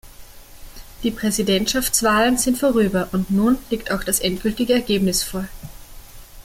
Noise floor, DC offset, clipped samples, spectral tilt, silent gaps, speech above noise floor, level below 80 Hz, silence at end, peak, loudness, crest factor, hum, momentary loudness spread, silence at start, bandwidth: -40 dBFS; under 0.1%; under 0.1%; -3.5 dB/octave; none; 21 dB; -40 dBFS; 0.05 s; -4 dBFS; -19 LUFS; 18 dB; none; 10 LU; 0.05 s; 17 kHz